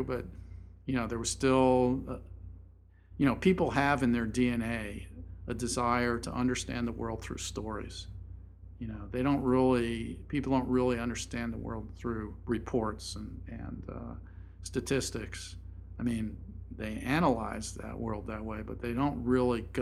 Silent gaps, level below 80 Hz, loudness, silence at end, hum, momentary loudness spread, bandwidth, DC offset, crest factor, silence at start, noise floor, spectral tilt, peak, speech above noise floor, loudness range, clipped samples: none; -48 dBFS; -32 LUFS; 0 s; none; 18 LU; 13 kHz; under 0.1%; 22 dB; 0 s; -56 dBFS; -5.5 dB/octave; -12 dBFS; 25 dB; 8 LU; under 0.1%